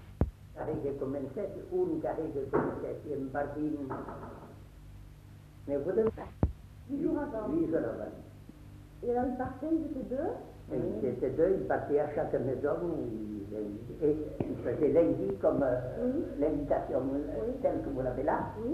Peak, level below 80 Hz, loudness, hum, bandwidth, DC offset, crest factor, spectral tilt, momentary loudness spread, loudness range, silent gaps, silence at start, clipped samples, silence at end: -14 dBFS; -48 dBFS; -33 LUFS; 50 Hz at -60 dBFS; 13.5 kHz; under 0.1%; 20 dB; -9.5 dB/octave; 17 LU; 6 LU; none; 0 s; under 0.1%; 0 s